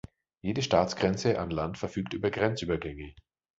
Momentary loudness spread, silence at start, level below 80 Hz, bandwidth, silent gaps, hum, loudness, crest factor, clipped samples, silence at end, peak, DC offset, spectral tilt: 12 LU; 0.45 s; -50 dBFS; 8 kHz; none; none; -30 LUFS; 22 dB; under 0.1%; 0.4 s; -8 dBFS; under 0.1%; -5.5 dB/octave